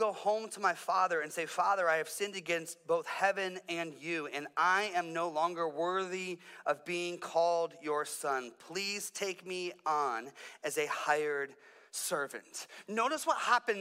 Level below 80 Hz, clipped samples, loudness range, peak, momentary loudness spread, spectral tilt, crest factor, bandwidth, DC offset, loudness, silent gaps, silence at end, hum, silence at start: under -90 dBFS; under 0.1%; 3 LU; -14 dBFS; 9 LU; -2.5 dB/octave; 20 dB; 16 kHz; under 0.1%; -34 LUFS; none; 0 s; none; 0 s